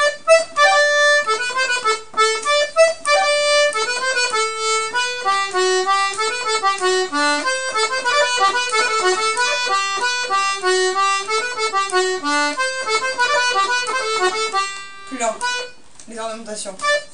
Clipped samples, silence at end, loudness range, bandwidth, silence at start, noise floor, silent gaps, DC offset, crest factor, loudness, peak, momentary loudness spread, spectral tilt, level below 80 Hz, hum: under 0.1%; 0.05 s; 4 LU; 10.5 kHz; 0 s; -40 dBFS; none; 1%; 18 dB; -17 LUFS; -2 dBFS; 8 LU; 0 dB/octave; -64 dBFS; none